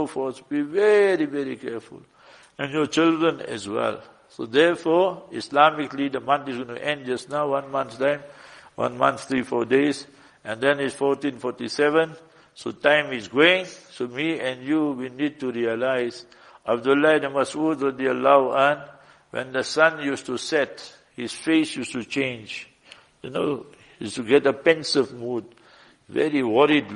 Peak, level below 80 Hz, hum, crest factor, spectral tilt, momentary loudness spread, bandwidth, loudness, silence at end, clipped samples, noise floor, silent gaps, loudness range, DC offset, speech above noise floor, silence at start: -2 dBFS; -68 dBFS; none; 22 dB; -4.5 dB/octave; 15 LU; 11 kHz; -23 LUFS; 0 s; under 0.1%; -53 dBFS; none; 4 LU; under 0.1%; 31 dB; 0 s